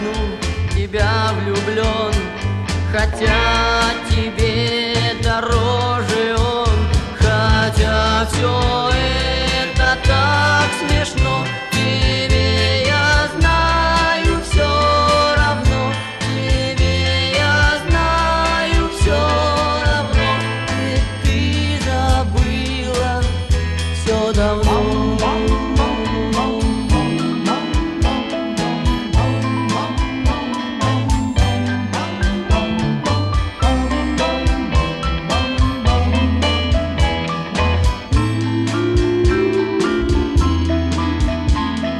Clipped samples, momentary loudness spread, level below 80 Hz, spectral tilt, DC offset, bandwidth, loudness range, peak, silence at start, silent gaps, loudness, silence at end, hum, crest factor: under 0.1%; 5 LU; -22 dBFS; -5.5 dB/octave; under 0.1%; 12.5 kHz; 3 LU; -2 dBFS; 0 s; none; -17 LUFS; 0 s; none; 14 dB